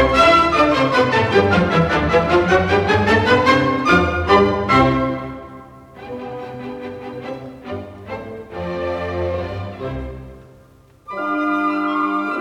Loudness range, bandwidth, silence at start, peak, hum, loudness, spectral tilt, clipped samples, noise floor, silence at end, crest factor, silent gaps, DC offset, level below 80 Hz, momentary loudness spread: 14 LU; 13 kHz; 0 s; -2 dBFS; none; -16 LUFS; -6 dB/octave; under 0.1%; -48 dBFS; 0 s; 16 dB; none; under 0.1%; -38 dBFS; 18 LU